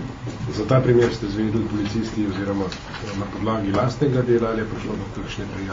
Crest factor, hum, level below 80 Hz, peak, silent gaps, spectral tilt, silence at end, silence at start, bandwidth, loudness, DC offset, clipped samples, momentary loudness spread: 18 dB; none; -42 dBFS; -4 dBFS; none; -7 dB/octave; 0 s; 0 s; 7.6 kHz; -23 LUFS; under 0.1%; under 0.1%; 12 LU